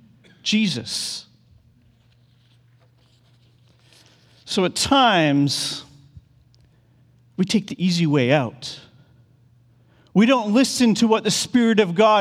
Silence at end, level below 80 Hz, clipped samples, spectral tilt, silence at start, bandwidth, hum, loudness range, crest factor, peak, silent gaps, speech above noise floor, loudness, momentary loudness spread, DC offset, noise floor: 0 s; -58 dBFS; under 0.1%; -4.5 dB/octave; 0.45 s; 15.5 kHz; none; 9 LU; 20 dB; -2 dBFS; none; 38 dB; -19 LUFS; 13 LU; under 0.1%; -57 dBFS